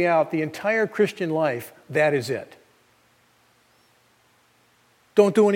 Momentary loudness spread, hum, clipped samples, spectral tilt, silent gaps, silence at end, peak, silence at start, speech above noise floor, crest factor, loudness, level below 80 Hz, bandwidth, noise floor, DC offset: 11 LU; 60 Hz at -65 dBFS; under 0.1%; -6 dB/octave; none; 0 s; -4 dBFS; 0 s; 40 dB; 20 dB; -23 LUFS; -76 dBFS; 17 kHz; -61 dBFS; under 0.1%